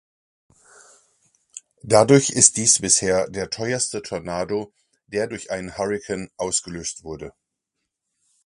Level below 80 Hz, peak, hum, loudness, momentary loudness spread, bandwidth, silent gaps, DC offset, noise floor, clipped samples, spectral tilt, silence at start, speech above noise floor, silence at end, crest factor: -54 dBFS; 0 dBFS; none; -20 LUFS; 22 LU; 11.5 kHz; none; under 0.1%; -80 dBFS; under 0.1%; -3 dB/octave; 1.55 s; 59 dB; 1.15 s; 24 dB